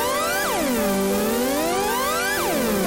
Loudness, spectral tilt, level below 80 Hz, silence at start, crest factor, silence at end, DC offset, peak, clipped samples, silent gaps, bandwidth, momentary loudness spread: -21 LUFS; -3 dB/octave; -44 dBFS; 0 s; 8 dB; 0 s; under 0.1%; -14 dBFS; under 0.1%; none; 17 kHz; 0 LU